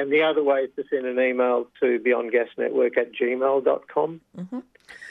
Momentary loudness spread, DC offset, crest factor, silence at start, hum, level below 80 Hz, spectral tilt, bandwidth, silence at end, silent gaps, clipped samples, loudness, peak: 15 LU; under 0.1%; 14 dB; 0 s; none; -76 dBFS; -7 dB/octave; 5.8 kHz; 0 s; none; under 0.1%; -23 LUFS; -8 dBFS